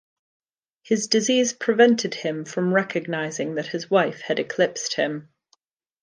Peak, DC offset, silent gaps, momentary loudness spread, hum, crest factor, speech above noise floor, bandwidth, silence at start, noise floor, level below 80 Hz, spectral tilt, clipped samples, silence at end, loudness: -4 dBFS; under 0.1%; none; 10 LU; none; 20 dB; 44 dB; 10.5 kHz; 0.9 s; -67 dBFS; -76 dBFS; -3.5 dB/octave; under 0.1%; 0.8 s; -22 LUFS